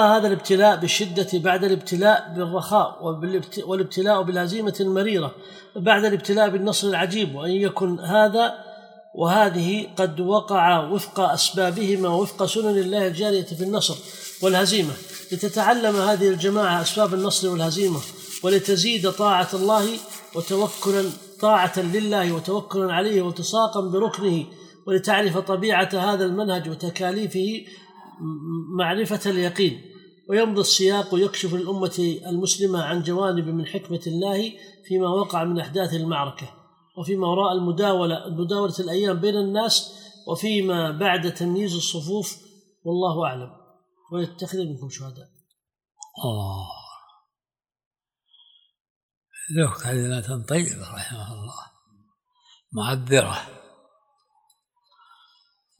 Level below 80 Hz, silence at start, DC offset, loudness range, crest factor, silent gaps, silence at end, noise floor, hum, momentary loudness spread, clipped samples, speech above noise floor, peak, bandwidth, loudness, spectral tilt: -70 dBFS; 0 s; under 0.1%; 9 LU; 22 dB; 47.86-47.91 s, 48.81-49.09 s, 49.17-49.22 s; 2.2 s; under -90 dBFS; none; 14 LU; under 0.1%; over 68 dB; -2 dBFS; 19.5 kHz; -22 LUFS; -4 dB/octave